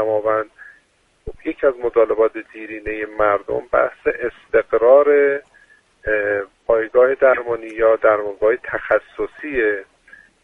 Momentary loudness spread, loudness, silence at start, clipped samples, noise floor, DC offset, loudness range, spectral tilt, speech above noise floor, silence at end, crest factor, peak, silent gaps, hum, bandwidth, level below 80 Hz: 14 LU; -18 LUFS; 0 s; under 0.1%; -59 dBFS; under 0.1%; 4 LU; -7 dB/octave; 41 dB; 0.6 s; 18 dB; -2 dBFS; none; none; 3.9 kHz; -46 dBFS